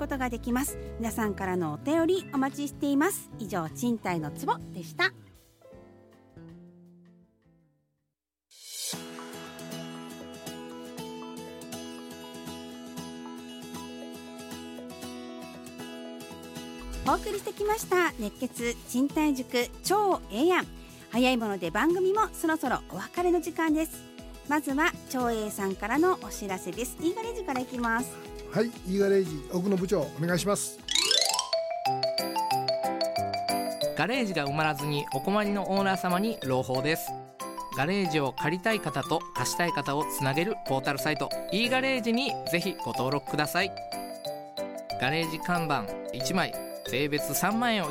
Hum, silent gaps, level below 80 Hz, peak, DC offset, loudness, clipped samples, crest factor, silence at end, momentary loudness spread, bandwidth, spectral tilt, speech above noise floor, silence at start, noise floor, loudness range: none; none; -52 dBFS; -8 dBFS; under 0.1%; -29 LUFS; under 0.1%; 22 dB; 0 s; 15 LU; 16.5 kHz; -4 dB/octave; 57 dB; 0 s; -85 dBFS; 14 LU